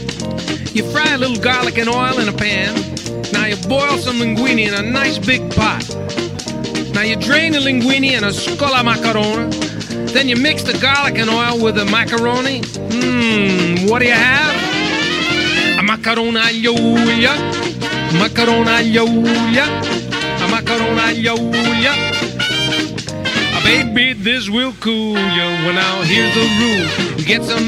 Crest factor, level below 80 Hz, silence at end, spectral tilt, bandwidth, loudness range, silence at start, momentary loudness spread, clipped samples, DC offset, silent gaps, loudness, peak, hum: 16 dB; -42 dBFS; 0 s; -4 dB/octave; 14.5 kHz; 3 LU; 0 s; 7 LU; under 0.1%; under 0.1%; none; -14 LUFS; 0 dBFS; none